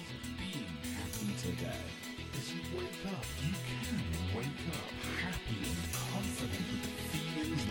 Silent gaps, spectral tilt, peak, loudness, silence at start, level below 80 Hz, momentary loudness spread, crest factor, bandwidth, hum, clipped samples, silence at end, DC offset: none; -4.5 dB/octave; -24 dBFS; -39 LUFS; 0 s; -52 dBFS; 4 LU; 16 dB; 17 kHz; none; under 0.1%; 0 s; under 0.1%